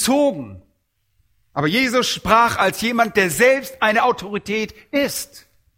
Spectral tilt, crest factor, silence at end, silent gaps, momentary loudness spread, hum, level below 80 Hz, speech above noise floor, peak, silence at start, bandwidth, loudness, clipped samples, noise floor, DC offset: -3.5 dB/octave; 20 dB; 0.4 s; none; 12 LU; none; -50 dBFS; 49 dB; 0 dBFS; 0 s; 16.5 kHz; -18 LUFS; under 0.1%; -68 dBFS; under 0.1%